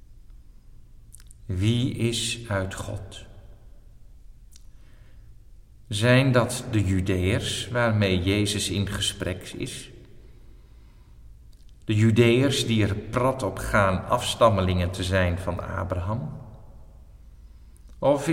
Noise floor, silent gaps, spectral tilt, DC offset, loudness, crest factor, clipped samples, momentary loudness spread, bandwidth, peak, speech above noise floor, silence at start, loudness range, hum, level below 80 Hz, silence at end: -49 dBFS; none; -5.5 dB/octave; under 0.1%; -24 LUFS; 20 dB; under 0.1%; 15 LU; 16 kHz; -6 dBFS; 25 dB; 0.1 s; 9 LU; none; -44 dBFS; 0 s